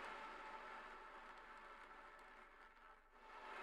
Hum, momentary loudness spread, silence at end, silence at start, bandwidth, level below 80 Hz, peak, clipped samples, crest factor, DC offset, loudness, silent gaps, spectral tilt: none; 10 LU; 0 s; 0 s; 12 kHz; -74 dBFS; -40 dBFS; under 0.1%; 18 dB; under 0.1%; -58 LUFS; none; -2.5 dB/octave